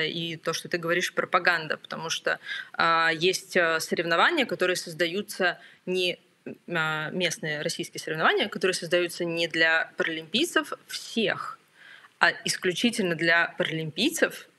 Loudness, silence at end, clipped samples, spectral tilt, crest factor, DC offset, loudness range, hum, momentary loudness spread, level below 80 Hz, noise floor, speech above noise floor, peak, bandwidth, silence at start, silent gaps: -26 LUFS; 0.15 s; under 0.1%; -3 dB/octave; 24 dB; under 0.1%; 3 LU; none; 10 LU; -82 dBFS; -52 dBFS; 25 dB; -2 dBFS; 15 kHz; 0 s; none